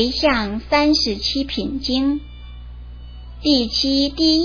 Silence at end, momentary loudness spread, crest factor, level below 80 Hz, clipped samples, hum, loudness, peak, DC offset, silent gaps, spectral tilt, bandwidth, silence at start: 0 s; 22 LU; 16 dB; -36 dBFS; under 0.1%; 60 Hz at -35 dBFS; -18 LUFS; -4 dBFS; under 0.1%; none; -4 dB/octave; 5.4 kHz; 0 s